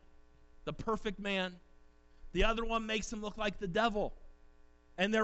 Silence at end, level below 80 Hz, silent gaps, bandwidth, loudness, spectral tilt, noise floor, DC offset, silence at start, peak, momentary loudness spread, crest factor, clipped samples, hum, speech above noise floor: 0 s; -46 dBFS; none; 8.2 kHz; -36 LUFS; -4.5 dB/octave; -60 dBFS; under 0.1%; 0.05 s; -18 dBFS; 9 LU; 18 dB; under 0.1%; none; 26 dB